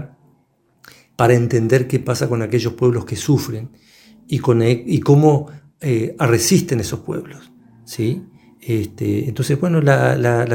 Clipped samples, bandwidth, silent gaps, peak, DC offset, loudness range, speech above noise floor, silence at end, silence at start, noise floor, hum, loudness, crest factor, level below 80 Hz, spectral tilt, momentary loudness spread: under 0.1%; 17 kHz; none; 0 dBFS; under 0.1%; 4 LU; 43 dB; 0 s; 0 s; -60 dBFS; none; -17 LUFS; 18 dB; -52 dBFS; -6 dB/octave; 14 LU